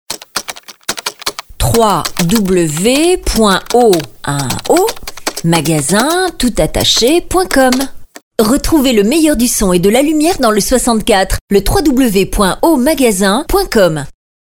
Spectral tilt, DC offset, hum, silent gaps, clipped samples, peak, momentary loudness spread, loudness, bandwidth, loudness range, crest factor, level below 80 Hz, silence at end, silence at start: -4 dB/octave; under 0.1%; none; 8.23-8.31 s, 11.41-11.48 s; under 0.1%; 0 dBFS; 10 LU; -12 LUFS; over 20 kHz; 2 LU; 12 dB; -26 dBFS; 0.3 s; 0.1 s